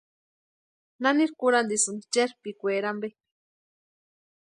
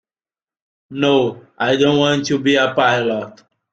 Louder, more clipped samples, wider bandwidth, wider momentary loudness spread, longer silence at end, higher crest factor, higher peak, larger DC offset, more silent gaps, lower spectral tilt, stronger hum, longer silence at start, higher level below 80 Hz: second, -26 LUFS vs -16 LUFS; neither; first, 11.5 kHz vs 7.8 kHz; about the same, 10 LU vs 10 LU; first, 1.3 s vs 0.45 s; about the same, 20 dB vs 16 dB; second, -10 dBFS vs -2 dBFS; neither; neither; second, -2.5 dB/octave vs -5 dB/octave; neither; about the same, 1 s vs 0.9 s; second, -82 dBFS vs -58 dBFS